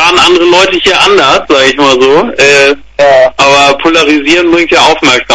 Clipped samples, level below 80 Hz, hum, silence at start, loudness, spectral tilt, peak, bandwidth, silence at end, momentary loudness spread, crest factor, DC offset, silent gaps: 4%; -36 dBFS; none; 0 s; -5 LUFS; -2.5 dB/octave; 0 dBFS; 11 kHz; 0 s; 3 LU; 6 dB; 1%; none